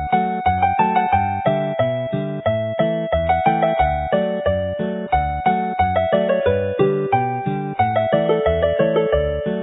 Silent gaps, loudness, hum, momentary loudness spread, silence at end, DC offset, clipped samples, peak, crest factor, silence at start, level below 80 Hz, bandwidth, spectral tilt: none; -19 LUFS; none; 5 LU; 0 s; under 0.1%; under 0.1%; -2 dBFS; 16 dB; 0 s; -34 dBFS; 4 kHz; -12 dB/octave